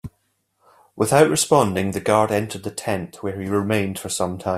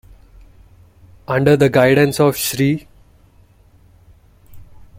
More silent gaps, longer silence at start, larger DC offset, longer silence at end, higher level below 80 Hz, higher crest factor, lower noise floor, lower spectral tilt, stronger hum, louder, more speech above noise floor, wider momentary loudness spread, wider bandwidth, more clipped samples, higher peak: neither; second, 0.05 s vs 1.3 s; neither; second, 0 s vs 0.15 s; second, -56 dBFS vs -48 dBFS; about the same, 20 dB vs 18 dB; first, -69 dBFS vs -50 dBFS; about the same, -4.5 dB/octave vs -5.5 dB/octave; neither; second, -21 LUFS vs -15 LUFS; first, 49 dB vs 36 dB; first, 13 LU vs 10 LU; about the same, 15.5 kHz vs 16.5 kHz; neither; about the same, -2 dBFS vs 0 dBFS